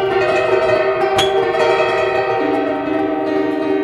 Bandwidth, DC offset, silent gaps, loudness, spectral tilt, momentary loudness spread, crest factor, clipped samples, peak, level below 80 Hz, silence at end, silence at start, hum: 13 kHz; under 0.1%; none; -16 LUFS; -4.5 dB/octave; 4 LU; 14 dB; under 0.1%; -2 dBFS; -50 dBFS; 0 s; 0 s; none